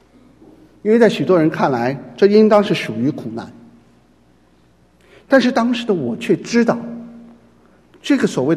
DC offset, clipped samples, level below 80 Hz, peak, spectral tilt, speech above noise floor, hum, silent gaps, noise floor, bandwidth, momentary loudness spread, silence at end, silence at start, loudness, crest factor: under 0.1%; under 0.1%; -60 dBFS; 0 dBFS; -6 dB/octave; 38 dB; none; none; -53 dBFS; 12.5 kHz; 16 LU; 0 s; 0.85 s; -16 LUFS; 18 dB